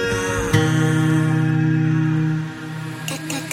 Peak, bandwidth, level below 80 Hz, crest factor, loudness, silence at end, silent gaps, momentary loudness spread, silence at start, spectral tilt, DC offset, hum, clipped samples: -2 dBFS; 16 kHz; -42 dBFS; 18 dB; -20 LUFS; 0 s; none; 10 LU; 0 s; -6 dB/octave; under 0.1%; none; under 0.1%